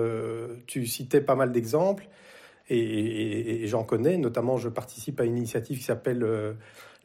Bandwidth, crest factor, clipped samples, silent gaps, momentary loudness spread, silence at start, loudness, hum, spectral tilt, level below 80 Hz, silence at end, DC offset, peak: 16.5 kHz; 18 dB; under 0.1%; none; 10 LU; 0 s; -28 LUFS; none; -6 dB/octave; -68 dBFS; 0.15 s; under 0.1%; -10 dBFS